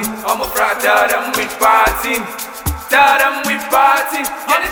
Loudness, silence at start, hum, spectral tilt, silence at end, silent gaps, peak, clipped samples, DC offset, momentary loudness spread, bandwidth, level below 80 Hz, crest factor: -14 LUFS; 0 s; none; -2.5 dB/octave; 0 s; none; 0 dBFS; under 0.1%; under 0.1%; 9 LU; over 20 kHz; -34 dBFS; 14 dB